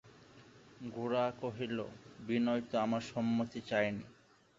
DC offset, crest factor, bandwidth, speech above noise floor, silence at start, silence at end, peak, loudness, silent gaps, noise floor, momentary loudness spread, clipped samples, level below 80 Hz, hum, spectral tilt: under 0.1%; 20 dB; 7.6 kHz; 23 dB; 0.05 s; 0.45 s; -18 dBFS; -36 LUFS; none; -59 dBFS; 13 LU; under 0.1%; -72 dBFS; none; -5 dB/octave